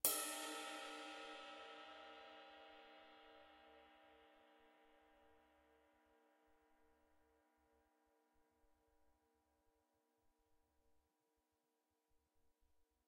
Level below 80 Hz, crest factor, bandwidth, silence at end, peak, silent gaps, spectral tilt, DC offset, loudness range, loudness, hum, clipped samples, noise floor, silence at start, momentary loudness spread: -88 dBFS; 38 dB; 14.5 kHz; 6.15 s; -18 dBFS; none; 0.5 dB/octave; under 0.1%; 17 LU; -49 LUFS; none; under 0.1%; -88 dBFS; 0.05 s; 21 LU